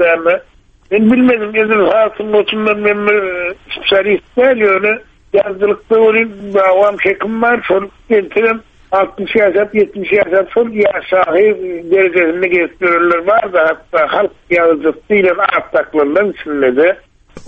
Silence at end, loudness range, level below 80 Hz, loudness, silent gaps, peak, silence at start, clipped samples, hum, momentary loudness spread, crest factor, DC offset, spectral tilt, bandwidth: 0 s; 1 LU; -48 dBFS; -12 LUFS; none; 0 dBFS; 0 s; under 0.1%; none; 5 LU; 12 dB; under 0.1%; -7 dB/octave; 5.4 kHz